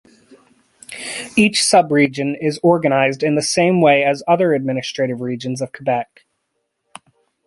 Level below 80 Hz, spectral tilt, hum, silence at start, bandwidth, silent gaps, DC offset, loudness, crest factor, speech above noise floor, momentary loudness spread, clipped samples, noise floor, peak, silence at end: -62 dBFS; -4.5 dB/octave; none; 0.9 s; 11.5 kHz; none; under 0.1%; -16 LUFS; 16 dB; 56 dB; 12 LU; under 0.1%; -72 dBFS; -2 dBFS; 1.45 s